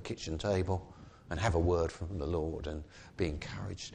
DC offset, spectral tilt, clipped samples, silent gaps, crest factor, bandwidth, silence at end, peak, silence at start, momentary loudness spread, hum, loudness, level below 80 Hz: under 0.1%; -6 dB/octave; under 0.1%; none; 18 dB; 9.8 kHz; 0 s; -18 dBFS; 0 s; 13 LU; none; -35 LUFS; -46 dBFS